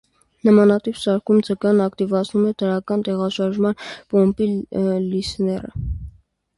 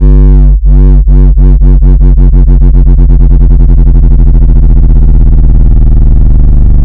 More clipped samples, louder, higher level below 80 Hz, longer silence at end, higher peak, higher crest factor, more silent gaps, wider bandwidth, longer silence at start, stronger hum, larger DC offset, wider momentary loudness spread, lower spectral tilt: second, under 0.1% vs 30%; second, -20 LUFS vs -6 LUFS; second, -40 dBFS vs -2 dBFS; first, 0.5 s vs 0 s; second, -4 dBFS vs 0 dBFS; first, 16 dB vs 2 dB; neither; first, 11.5 kHz vs 1.6 kHz; first, 0.45 s vs 0 s; neither; neither; first, 9 LU vs 1 LU; second, -7 dB/octave vs -12.5 dB/octave